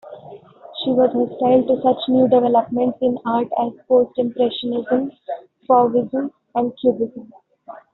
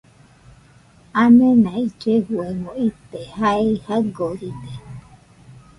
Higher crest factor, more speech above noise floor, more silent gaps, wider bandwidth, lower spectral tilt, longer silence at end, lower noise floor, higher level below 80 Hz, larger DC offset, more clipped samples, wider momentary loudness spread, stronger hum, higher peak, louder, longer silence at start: about the same, 16 dB vs 16 dB; second, 23 dB vs 32 dB; neither; second, 4.1 kHz vs 10.5 kHz; second, -5 dB/octave vs -7.5 dB/octave; about the same, 0.15 s vs 0.25 s; second, -41 dBFS vs -50 dBFS; second, -62 dBFS vs -52 dBFS; neither; neither; second, 13 LU vs 23 LU; neither; about the same, -2 dBFS vs -4 dBFS; about the same, -19 LUFS vs -18 LUFS; second, 0.05 s vs 1.15 s